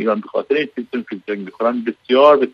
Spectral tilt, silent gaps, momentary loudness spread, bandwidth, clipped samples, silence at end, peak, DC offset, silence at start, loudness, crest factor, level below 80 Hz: -7 dB/octave; none; 15 LU; 6 kHz; under 0.1%; 0.05 s; 0 dBFS; under 0.1%; 0 s; -18 LUFS; 16 dB; -70 dBFS